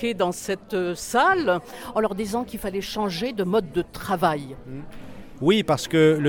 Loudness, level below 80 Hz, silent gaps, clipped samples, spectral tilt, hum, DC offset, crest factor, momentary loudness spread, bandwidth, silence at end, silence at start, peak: -24 LUFS; -48 dBFS; none; under 0.1%; -5 dB/octave; none; under 0.1%; 18 dB; 18 LU; 19 kHz; 0 s; 0 s; -6 dBFS